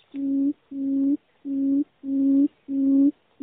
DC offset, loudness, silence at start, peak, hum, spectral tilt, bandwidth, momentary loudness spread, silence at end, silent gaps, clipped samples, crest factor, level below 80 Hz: under 0.1%; -24 LUFS; 0.15 s; -12 dBFS; none; -9.5 dB/octave; 1.2 kHz; 8 LU; 0.3 s; none; under 0.1%; 12 dB; -70 dBFS